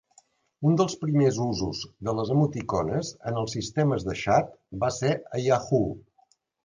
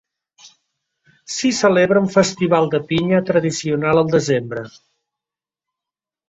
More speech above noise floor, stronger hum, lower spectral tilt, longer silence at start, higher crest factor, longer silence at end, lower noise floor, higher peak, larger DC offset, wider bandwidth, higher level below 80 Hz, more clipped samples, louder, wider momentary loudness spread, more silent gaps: second, 40 dB vs 72 dB; neither; first, -6.5 dB/octave vs -5 dB/octave; first, 0.6 s vs 0.45 s; about the same, 18 dB vs 18 dB; second, 0.65 s vs 1.6 s; second, -66 dBFS vs -89 dBFS; second, -8 dBFS vs -2 dBFS; neither; first, 9.8 kHz vs 8.2 kHz; about the same, -52 dBFS vs -54 dBFS; neither; second, -26 LUFS vs -17 LUFS; about the same, 8 LU vs 9 LU; neither